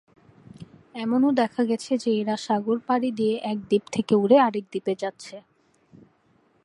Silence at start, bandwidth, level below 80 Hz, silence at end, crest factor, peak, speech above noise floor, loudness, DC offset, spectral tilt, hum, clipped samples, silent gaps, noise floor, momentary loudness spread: 0.6 s; 11 kHz; -70 dBFS; 1.25 s; 20 dB; -6 dBFS; 40 dB; -24 LUFS; under 0.1%; -6 dB/octave; none; under 0.1%; none; -63 dBFS; 13 LU